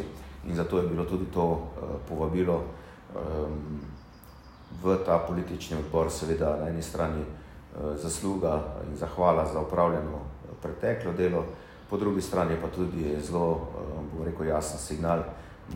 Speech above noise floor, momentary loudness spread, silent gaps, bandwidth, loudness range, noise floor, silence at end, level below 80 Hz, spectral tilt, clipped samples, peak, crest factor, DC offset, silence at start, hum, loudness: 20 dB; 14 LU; none; 16 kHz; 3 LU; -49 dBFS; 0 s; -44 dBFS; -6.5 dB/octave; under 0.1%; -10 dBFS; 20 dB; under 0.1%; 0 s; none; -30 LUFS